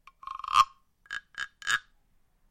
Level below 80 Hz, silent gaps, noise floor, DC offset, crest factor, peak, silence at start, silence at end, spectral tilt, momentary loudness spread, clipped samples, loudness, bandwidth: -62 dBFS; none; -66 dBFS; under 0.1%; 24 dB; -8 dBFS; 0.25 s; 0.7 s; 1.5 dB/octave; 16 LU; under 0.1%; -29 LUFS; 16.5 kHz